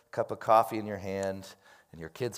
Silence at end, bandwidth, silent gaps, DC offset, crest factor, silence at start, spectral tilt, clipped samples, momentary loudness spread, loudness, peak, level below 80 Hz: 0 s; 16 kHz; none; under 0.1%; 22 dB; 0.15 s; -5.5 dB/octave; under 0.1%; 21 LU; -30 LUFS; -10 dBFS; -72 dBFS